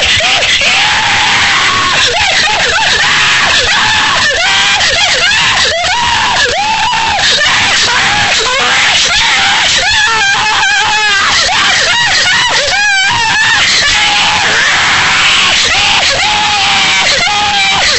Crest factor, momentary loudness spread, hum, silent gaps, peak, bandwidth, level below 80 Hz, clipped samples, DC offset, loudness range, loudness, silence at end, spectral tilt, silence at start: 10 dB; 2 LU; none; none; 0 dBFS; 11 kHz; -34 dBFS; under 0.1%; 1%; 1 LU; -7 LUFS; 0 s; 0 dB/octave; 0 s